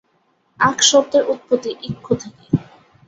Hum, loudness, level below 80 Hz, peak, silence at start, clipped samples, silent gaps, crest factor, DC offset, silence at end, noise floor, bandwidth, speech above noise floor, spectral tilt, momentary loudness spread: none; -18 LUFS; -54 dBFS; -2 dBFS; 0.6 s; under 0.1%; none; 18 dB; under 0.1%; 0.45 s; -63 dBFS; 7.8 kHz; 45 dB; -3 dB/octave; 11 LU